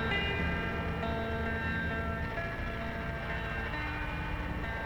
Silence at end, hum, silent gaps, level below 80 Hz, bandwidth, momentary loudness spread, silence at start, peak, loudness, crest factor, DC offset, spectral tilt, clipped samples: 0 s; none; none; -40 dBFS; 20 kHz; 5 LU; 0 s; -20 dBFS; -35 LUFS; 16 dB; under 0.1%; -6.5 dB/octave; under 0.1%